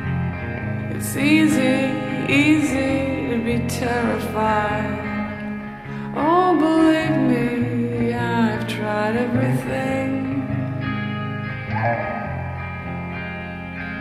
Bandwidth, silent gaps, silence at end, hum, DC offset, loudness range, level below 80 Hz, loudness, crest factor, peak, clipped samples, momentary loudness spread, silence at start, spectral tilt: 15 kHz; none; 0 s; none; under 0.1%; 6 LU; -44 dBFS; -21 LUFS; 16 dB; -4 dBFS; under 0.1%; 12 LU; 0 s; -6.5 dB/octave